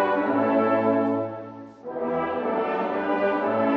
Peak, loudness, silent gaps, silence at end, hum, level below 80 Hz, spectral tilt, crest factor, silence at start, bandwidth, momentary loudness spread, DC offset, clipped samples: -10 dBFS; -24 LUFS; none; 0 s; none; -70 dBFS; -5 dB/octave; 14 dB; 0 s; 5.8 kHz; 14 LU; under 0.1%; under 0.1%